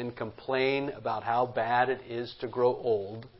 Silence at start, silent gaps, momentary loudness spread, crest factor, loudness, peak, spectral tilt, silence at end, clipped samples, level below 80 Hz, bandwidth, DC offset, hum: 0 s; none; 9 LU; 18 dB; -30 LUFS; -12 dBFS; -9.5 dB/octave; 0 s; under 0.1%; -66 dBFS; 5.8 kHz; under 0.1%; none